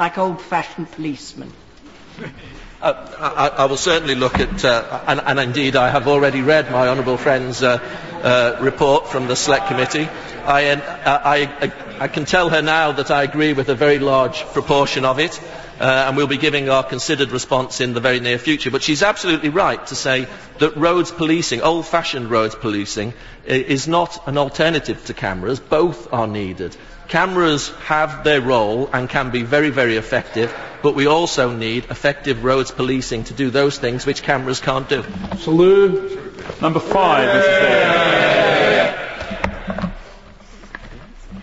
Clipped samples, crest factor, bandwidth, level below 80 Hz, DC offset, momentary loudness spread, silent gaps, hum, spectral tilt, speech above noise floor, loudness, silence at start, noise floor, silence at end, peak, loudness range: under 0.1%; 16 dB; 8 kHz; -42 dBFS; 0.3%; 12 LU; none; none; -4.5 dB/octave; 25 dB; -17 LUFS; 0 s; -42 dBFS; 0 s; 0 dBFS; 5 LU